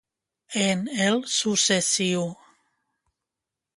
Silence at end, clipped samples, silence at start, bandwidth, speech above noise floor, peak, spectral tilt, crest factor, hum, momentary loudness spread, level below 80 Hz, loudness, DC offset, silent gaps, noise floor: 1.45 s; under 0.1%; 0.5 s; 11.5 kHz; 63 dB; -8 dBFS; -3 dB/octave; 20 dB; none; 8 LU; -68 dBFS; -23 LUFS; under 0.1%; none; -87 dBFS